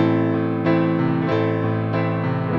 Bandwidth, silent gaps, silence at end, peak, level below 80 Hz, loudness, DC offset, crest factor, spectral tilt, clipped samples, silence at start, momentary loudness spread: 6 kHz; none; 0 s; -6 dBFS; -56 dBFS; -21 LUFS; under 0.1%; 14 dB; -10 dB/octave; under 0.1%; 0 s; 3 LU